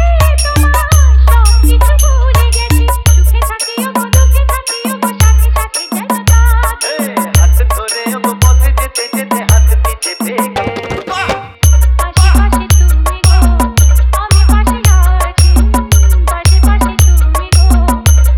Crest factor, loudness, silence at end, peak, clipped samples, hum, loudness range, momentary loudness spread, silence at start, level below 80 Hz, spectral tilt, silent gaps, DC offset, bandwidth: 8 dB; -10 LUFS; 0 s; 0 dBFS; 0.5%; none; 3 LU; 7 LU; 0 s; -10 dBFS; -4.5 dB/octave; none; under 0.1%; 16.5 kHz